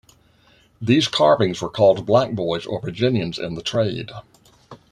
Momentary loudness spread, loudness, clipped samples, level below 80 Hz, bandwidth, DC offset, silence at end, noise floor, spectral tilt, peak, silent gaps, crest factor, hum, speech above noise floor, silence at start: 13 LU; -20 LUFS; under 0.1%; -54 dBFS; 11 kHz; under 0.1%; 0.15 s; -56 dBFS; -6 dB/octave; -2 dBFS; none; 18 dB; none; 36 dB; 0.8 s